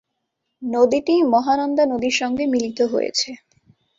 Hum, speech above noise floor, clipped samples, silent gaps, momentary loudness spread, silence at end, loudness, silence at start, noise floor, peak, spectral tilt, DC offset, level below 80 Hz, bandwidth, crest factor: none; 57 dB; under 0.1%; none; 7 LU; 0.6 s; -19 LUFS; 0.6 s; -76 dBFS; -4 dBFS; -3 dB/octave; under 0.1%; -60 dBFS; 7.8 kHz; 16 dB